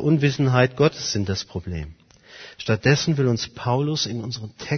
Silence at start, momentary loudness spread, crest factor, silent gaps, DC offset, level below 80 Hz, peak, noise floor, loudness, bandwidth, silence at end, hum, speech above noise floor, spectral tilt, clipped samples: 0 s; 14 LU; 20 dB; none; under 0.1%; -48 dBFS; -2 dBFS; -45 dBFS; -22 LUFS; 6.6 kHz; 0 s; none; 24 dB; -5.5 dB/octave; under 0.1%